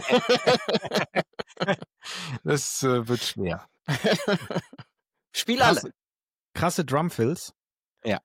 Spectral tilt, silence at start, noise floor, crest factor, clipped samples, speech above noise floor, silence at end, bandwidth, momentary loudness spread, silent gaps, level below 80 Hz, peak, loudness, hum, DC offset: -4 dB/octave; 0 s; under -90 dBFS; 18 dB; under 0.1%; over 65 dB; 0.05 s; 17 kHz; 14 LU; 6.08-6.12 s, 6.23-6.28 s, 6.39-6.43 s, 7.86-7.91 s; -60 dBFS; -8 dBFS; -26 LUFS; none; under 0.1%